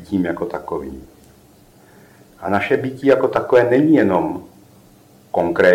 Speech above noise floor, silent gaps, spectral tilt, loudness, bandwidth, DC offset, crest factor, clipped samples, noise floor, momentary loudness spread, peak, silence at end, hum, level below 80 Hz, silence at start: 32 dB; none; -7.5 dB/octave; -17 LUFS; 16 kHz; under 0.1%; 18 dB; under 0.1%; -49 dBFS; 15 LU; -2 dBFS; 0 s; none; -52 dBFS; 0 s